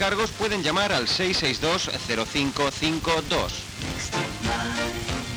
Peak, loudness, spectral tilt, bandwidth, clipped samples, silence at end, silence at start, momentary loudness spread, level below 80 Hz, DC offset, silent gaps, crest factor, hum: -10 dBFS; -25 LUFS; -3.5 dB/octave; over 20 kHz; under 0.1%; 0 s; 0 s; 6 LU; -42 dBFS; under 0.1%; none; 16 dB; none